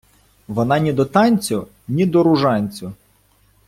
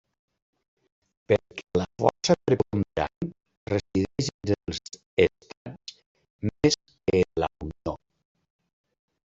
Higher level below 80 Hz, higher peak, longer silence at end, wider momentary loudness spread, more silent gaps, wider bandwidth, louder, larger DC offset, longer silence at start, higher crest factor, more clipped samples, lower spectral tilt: about the same, -52 dBFS vs -52 dBFS; about the same, -2 dBFS vs -4 dBFS; second, 0.75 s vs 1.3 s; second, 12 LU vs 17 LU; second, none vs 3.16-3.21 s, 3.57-3.66 s, 4.34-4.39 s, 5.06-5.17 s, 5.57-5.65 s, 6.06-6.15 s, 6.30-6.39 s; first, 16 kHz vs 8 kHz; first, -18 LUFS vs -27 LUFS; neither; second, 0.5 s vs 1.3 s; second, 16 dB vs 24 dB; neither; about the same, -6.5 dB/octave vs -5.5 dB/octave